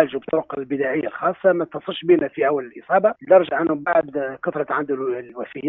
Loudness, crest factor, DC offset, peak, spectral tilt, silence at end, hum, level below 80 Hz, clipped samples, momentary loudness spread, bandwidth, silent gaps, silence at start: -21 LUFS; 20 dB; under 0.1%; -2 dBFS; -4 dB/octave; 0 s; none; -66 dBFS; under 0.1%; 11 LU; 4 kHz; none; 0 s